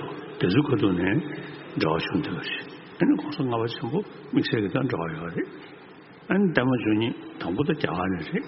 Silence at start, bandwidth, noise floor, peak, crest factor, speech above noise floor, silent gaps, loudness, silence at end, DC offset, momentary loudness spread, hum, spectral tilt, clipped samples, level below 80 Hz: 0 s; 5.8 kHz; -47 dBFS; -4 dBFS; 22 dB; 22 dB; none; -26 LUFS; 0 s; under 0.1%; 13 LU; none; -5.5 dB/octave; under 0.1%; -58 dBFS